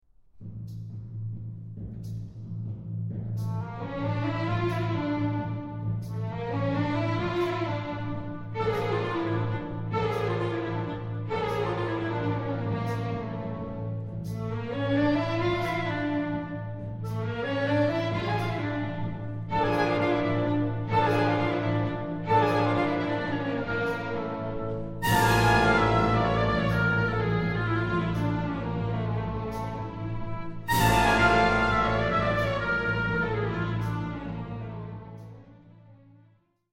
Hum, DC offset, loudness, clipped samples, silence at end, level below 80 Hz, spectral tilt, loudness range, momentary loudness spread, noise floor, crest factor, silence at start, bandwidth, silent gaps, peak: none; under 0.1%; -28 LUFS; under 0.1%; 0.75 s; -44 dBFS; -6.5 dB/octave; 7 LU; 13 LU; -63 dBFS; 18 dB; 0.35 s; 16.5 kHz; none; -10 dBFS